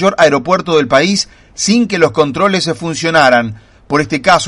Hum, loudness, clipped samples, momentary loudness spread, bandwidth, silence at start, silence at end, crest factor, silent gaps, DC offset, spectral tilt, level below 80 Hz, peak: none; -12 LUFS; 0.2%; 7 LU; 11.5 kHz; 0 s; 0 s; 12 dB; none; under 0.1%; -4 dB/octave; -44 dBFS; 0 dBFS